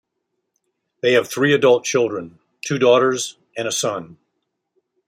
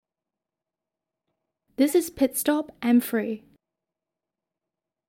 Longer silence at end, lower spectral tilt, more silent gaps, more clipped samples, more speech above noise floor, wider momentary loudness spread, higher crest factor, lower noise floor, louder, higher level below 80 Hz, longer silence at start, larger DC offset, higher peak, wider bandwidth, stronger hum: second, 0.95 s vs 1.7 s; about the same, -3.5 dB/octave vs -4 dB/octave; neither; neither; second, 58 dB vs 65 dB; about the same, 13 LU vs 12 LU; about the same, 18 dB vs 20 dB; second, -76 dBFS vs -88 dBFS; first, -18 LUFS vs -24 LUFS; about the same, -68 dBFS vs -64 dBFS; second, 1.05 s vs 1.8 s; neither; first, -2 dBFS vs -8 dBFS; about the same, 16 kHz vs 16.5 kHz; neither